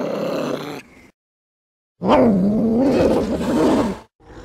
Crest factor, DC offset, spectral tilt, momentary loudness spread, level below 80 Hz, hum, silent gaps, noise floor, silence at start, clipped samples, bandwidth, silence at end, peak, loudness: 16 dB; under 0.1%; -7 dB/octave; 13 LU; -42 dBFS; none; 1.14-1.95 s, 4.15-4.19 s; under -90 dBFS; 0 s; under 0.1%; 14.5 kHz; 0 s; -4 dBFS; -18 LUFS